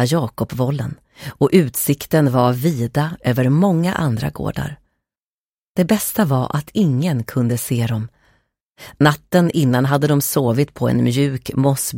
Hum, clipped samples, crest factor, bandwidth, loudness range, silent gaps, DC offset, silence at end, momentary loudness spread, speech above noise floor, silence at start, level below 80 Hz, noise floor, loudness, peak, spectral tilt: none; under 0.1%; 16 dB; 17 kHz; 3 LU; 5.22-5.75 s, 8.65-8.73 s; under 0.1%; 0 s; 9 LU; over 73 dB; 0 s; -48 dBFS; under -90 dBFS; -18 LUFS; 0 dBFS; -6 dB/octave